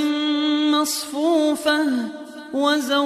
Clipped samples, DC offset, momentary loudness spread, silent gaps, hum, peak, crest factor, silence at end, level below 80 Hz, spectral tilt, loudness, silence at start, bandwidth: under 0.1%; under 0.1%; 8 LU; none; none; -6 dBFS; 14 dB; 0 s; -68 dBFS; -2 dB/octave; -20 LUFS; 0 s; 15 kHz